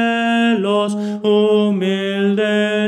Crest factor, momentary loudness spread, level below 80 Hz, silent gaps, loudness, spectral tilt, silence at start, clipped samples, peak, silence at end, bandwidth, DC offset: 12 dB; 4 LU; -70 dBFS; none; -16 LUFS; -6 dB/octave; 0 s; under 0.1%; -4 dBFS; 0 s; 11 kHz; under 0.1%